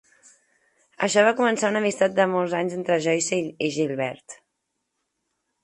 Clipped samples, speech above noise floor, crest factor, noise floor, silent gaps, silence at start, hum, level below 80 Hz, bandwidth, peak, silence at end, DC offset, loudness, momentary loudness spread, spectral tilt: under 0.1%; 56 dB; 20 dB; -78 dBFS; none; 1 s; none; -72 dBFS; 11.5 kHz; -6 dBFS; 1.3 s; under 0.1%; -23 LUFS; 8 LU; -4 dB/octave